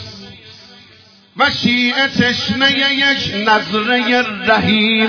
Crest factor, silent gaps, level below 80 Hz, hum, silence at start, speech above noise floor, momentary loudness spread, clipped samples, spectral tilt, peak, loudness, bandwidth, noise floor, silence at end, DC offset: 16 dB; none; -50 dBFS; none; 0 s; 31 dB; 4 LU; under 0.1%; -4.5 dB/octave; 0 dBFS; -13 LUFS; 5.4 kHz; -45 dBFS; 0 s; under 0.1%